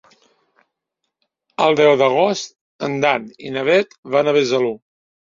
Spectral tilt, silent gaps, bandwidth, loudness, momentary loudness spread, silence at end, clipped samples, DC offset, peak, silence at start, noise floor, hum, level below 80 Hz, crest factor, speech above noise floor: -4.5 dB/octave; 2.61-2.79 s, 3.98-4.03 s; 7.6 kHz; -17 LUFS; 14 LU; 0.5 s; under 0.1%; under 0.1%; -2 dBFS; 1.6 s; -78 dBFS; none; -66 dBFS; 18 dB; 61 dB